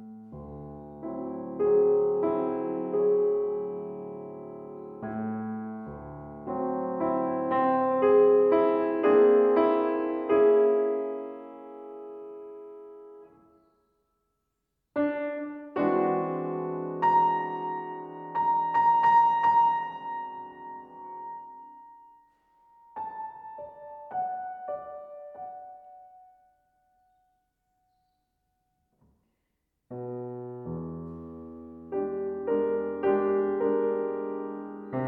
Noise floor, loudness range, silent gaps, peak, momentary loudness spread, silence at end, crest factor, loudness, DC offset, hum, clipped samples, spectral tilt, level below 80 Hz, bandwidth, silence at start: -80 dBFS; 20 LU; none; -10 dBFS; 22 LU; 0 s; 18 dB; -26 LUFS; under 0.1%; none; under 0.1%; -9 dB/octave; -64 dBFS; 4.6 kHz; 0 s